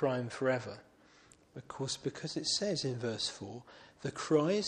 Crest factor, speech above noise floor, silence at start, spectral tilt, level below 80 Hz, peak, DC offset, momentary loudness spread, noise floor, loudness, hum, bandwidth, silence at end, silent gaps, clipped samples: 20 dB; 27 dB; 0 s; -4 dB/octave; -72 dBFS; -16 dBFS; under 0.1%; 19 LU; -63 dBFS; -35 LUFS; none; 11.5 kHz; 0 s; none; under 0.1%